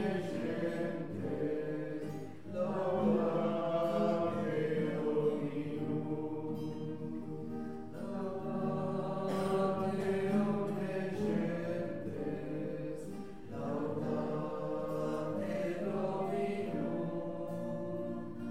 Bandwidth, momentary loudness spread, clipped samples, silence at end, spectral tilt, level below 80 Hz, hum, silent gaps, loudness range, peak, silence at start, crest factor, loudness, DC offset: 15 kHz; 9 LU; under 0.1%; 0 s; -8 dB/octave; -64 dBFS; none; none; 5 LU; -20 dBFS; 0 s; 16 dB; -37 LUFS; 0.4%